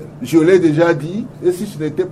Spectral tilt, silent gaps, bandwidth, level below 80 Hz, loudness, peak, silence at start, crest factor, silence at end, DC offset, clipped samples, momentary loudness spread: -7 dB/octave; none; 14.5 kHz; -52 dBFS; -15 LUFS; 0 dBFS; 0 s; 14 dB; 0 s; under 0.1%; under 0.1%; 11 LU